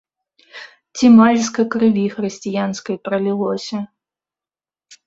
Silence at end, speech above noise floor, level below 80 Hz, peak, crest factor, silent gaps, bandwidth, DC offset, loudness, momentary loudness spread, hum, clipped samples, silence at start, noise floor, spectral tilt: 0.15 s; over 74 dB; -60 dBFS; -2 dBFS; 16 dB; none; 7.8 kHz; under 0.1%; -17 LUFS; 23 LU; none; under 0.1%; 0.55 s; under -90 dBFS; -5.5 dB/octave